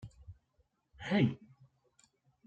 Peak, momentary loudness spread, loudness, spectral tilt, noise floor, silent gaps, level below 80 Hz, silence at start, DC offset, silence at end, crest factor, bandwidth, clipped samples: -18 dBFS; 26 LU; -33 LUFS; -7.5 dB/octave; -76 dBFS; none; -66 dBFS; 0 s; under 0.1%; 1.1 s; 22 dB; 8.6 kHz; under 0.1%